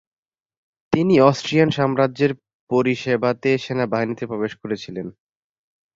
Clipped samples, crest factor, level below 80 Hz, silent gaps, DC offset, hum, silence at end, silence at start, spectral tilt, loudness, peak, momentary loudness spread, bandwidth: under 0.1%; 20 dB; -58 dBFS; 2.54-2.67 s; under 0.1%; none; 0.85 s; 0.9 s; -6.5 dB/octave; -20 LUFS; -2 dBFS; 13 LU; 7.8 kHz